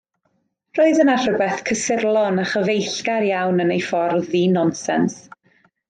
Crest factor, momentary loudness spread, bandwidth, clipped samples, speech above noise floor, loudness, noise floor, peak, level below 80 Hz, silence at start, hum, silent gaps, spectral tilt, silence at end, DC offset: 16 dB; 5 LU; 9.4 kHz; under 0.1%; 50 dB; -19 LUFS; -68 dBFS; -4 dBFS; -62 dBFS; 0.75 s; none; none; -5 dB/octave; 0.7 s; under 0.1%